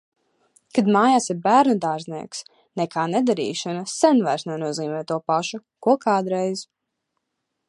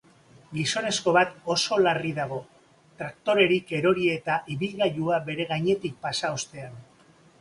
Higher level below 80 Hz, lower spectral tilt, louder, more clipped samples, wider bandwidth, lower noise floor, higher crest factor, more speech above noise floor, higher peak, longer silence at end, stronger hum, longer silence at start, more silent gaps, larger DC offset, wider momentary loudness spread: second, -74 dBFS vs -64 dBFS; about the same, -5 dB/octave vs -4 dB/octave; first, -22 LUFS vs -25 LUFS; neither; about the same, 11.5 kHz vs 11.5 kHz; first, -78 dBFS vs -57 dBFS; about the same, 20 dB vs 20 dB; first, 58 dB vs 31 dB; first, -2 dBFS vs -8 dBFS; first, 1.05 s vs 0.6 s; neither; first, 0.75 s vs 0.5 s; neither; neither; about the same, 14 LU vs 14 LU